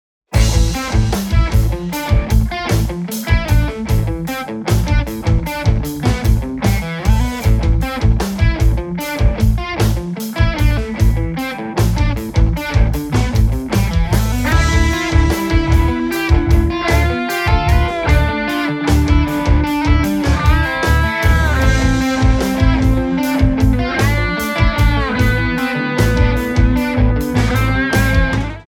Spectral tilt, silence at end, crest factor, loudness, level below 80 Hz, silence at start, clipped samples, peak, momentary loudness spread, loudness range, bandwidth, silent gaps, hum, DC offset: -6 dB/octave; 0.1 s; 12 dB; -16 LUFS; -18 dBFS; 0.3 s; under 0.1%; -2 dBFS; 4 LU; 3 LU; 17.5 kHz; none; none; under 0.1%